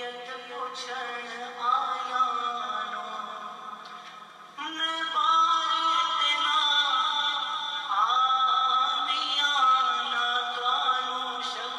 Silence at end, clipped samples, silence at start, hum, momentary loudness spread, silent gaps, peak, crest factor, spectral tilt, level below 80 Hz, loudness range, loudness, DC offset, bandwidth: 0 s; under 0.1%; 0 s; none; 16 LU; none; -12 dBFS; 14 dB; 0.5 dB/octave; under -90 dBFS; 7 LU; -25 LUFS; under 0.1%; 12 kHz